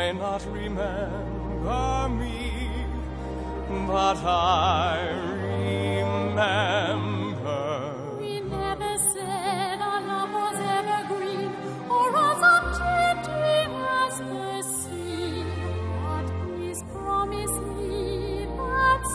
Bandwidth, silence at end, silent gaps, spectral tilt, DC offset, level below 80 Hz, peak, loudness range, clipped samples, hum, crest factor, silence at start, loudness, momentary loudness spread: 11 kHz; 0 s; none; -4 dB/octave; under 0.1%; -38 dBFS; -8 dBFS; 6 LU; under 0.1%; none; 18 dB; 0 s; -26 LUFS; 10 LU